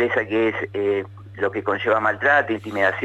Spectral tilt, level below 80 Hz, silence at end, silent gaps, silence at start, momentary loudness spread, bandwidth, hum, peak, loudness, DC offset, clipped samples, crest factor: -6.5 dB/octave; -60 dBFS; 0 s; none; 0 s; 8 LU; 8.4 kHz; none; -6 dBFS; -21 LUFS; under 0.1%; under 0.1%; 16 dB